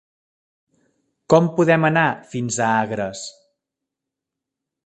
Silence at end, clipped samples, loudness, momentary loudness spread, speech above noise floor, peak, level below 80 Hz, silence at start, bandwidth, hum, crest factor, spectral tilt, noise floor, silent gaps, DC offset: 1.55 s; under 0.1%; -19 LUFS; 13 LU; 66 dB; 0 dBFS; -62 dBFS; 1.3 s; 9.2 kHz; none; 22 dB; -5.5 dB/octave; -84 dBFS; none; under 0.1%